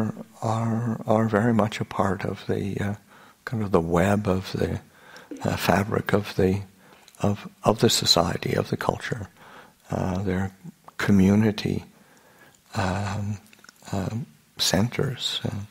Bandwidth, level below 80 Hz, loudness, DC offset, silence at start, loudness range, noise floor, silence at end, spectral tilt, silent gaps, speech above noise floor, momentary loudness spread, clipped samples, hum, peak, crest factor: 16 kHz; -52 dBFS; -25 LUFS; under 0.1%; 0 s; 4 LU; -55 dBFS; 0.05 s; -5 dB/octave; none; 31 dB; 14 LU; under 0.1%; none; -2 dBFS; 24 dB